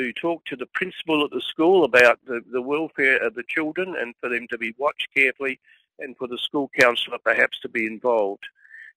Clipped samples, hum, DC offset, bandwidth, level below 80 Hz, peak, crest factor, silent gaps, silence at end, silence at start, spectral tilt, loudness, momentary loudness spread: under 0.1%; none; under 0.1%; 15 kHz; -66 dBFS; -2 dBFS; 20 dB; none; 0.1 s; 0 s; -4 dB/octave; -22 LUFS; 12 LU